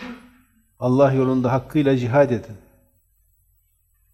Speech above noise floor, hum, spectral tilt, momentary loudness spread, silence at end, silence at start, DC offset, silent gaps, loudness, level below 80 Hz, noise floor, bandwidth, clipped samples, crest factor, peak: 45 dB; none; -8.5 dB/octave; 10 LU; 1.55 s; 0 s; under 0.1%; none; -19 LUFS; -54 dBFS; -63 dBFS; 12.5 kHz; under 0.1%; 18 dB; -4 dBFS